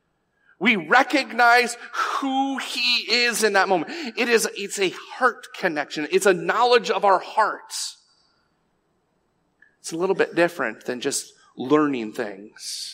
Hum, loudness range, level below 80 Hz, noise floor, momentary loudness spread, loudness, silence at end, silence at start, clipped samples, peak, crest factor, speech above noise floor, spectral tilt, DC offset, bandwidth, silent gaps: none; 8 LU; -80 dBFS; -69 dBFS; 12 LU; -21 LUFS; 0 s; 0.6 s; under 0.1%; -2 dBFS; 20 dB; 47 dB; -2.5 dB/octave; under 0.1%; 16 kHz; none